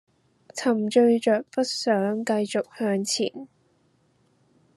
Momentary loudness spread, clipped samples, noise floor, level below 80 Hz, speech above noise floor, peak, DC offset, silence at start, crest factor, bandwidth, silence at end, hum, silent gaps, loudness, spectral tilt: 9 LU; under 0.1%; -65 dBFS; -78 dBFS; 42 dB; -8 dBFS; under 0.1%; 0.55 s; 18 dB; 12.5 kHz; 1.3 s; none; none; -24 LUFS; -4.5 dB/octave